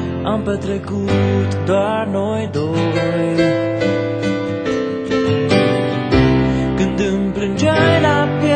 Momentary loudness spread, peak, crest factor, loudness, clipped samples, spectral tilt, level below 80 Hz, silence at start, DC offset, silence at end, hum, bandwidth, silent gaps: 6 LU; 0 dBFS; 16 dB; -17 LUFS; under 0.1%; -7 dB/octave; -36 dBFS; 0 s; under 0.1%; 0 s; none; 9.2 kHz; none